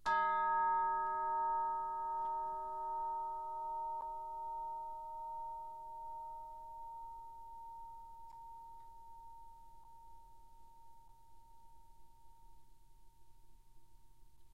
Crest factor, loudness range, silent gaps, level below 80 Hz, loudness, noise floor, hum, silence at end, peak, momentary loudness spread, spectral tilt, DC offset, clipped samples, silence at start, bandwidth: 18 dB; 23 LU; none; -66 dBFS; -40 LUFS; -63 dBFS; none; 0 s; -24 dBFS; 23 LU; -4 dB/octave; 0.1%; under 0.1%; 0.05 s; 13 kHz